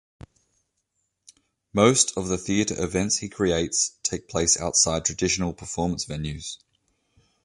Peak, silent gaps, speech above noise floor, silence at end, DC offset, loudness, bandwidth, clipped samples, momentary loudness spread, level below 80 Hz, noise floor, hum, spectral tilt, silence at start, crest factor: -4 dBFS; none; 52 dB; 0.9 s; under 0.1%; -23 LUFS; 11.5 kHz; under 0.1%; 11 LU; -46 dBFS; -76 dBFS; none; -3 dB/octave; 1.75 s; 22 dB